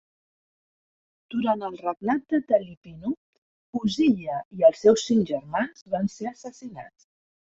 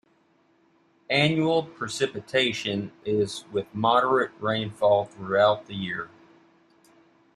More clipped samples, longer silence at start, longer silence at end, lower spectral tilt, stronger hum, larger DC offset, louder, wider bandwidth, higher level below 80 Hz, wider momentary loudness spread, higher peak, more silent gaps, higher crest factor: neither; first, 1.3 s vs 1.1 s; second, 0.7 s vs 1.3 s; about the same, -5.5 dB/octave vs -5 dB/octave; neither; neither; about the same, -25 LUFS vs -25 LUFS; second, 8 kHz vs 12.5 kHz; about the same, -64 dBFS vs -66 dBFS; first, 18 LU vs 10 LU; about the same, -6 dBFS vs -8 dBFS; first, 2.77-2.82 s, 3.17-3.73 s, 4.45-4.51 s, 5.82-5.86 s vs none; about the same, 20 dB vs 20 dB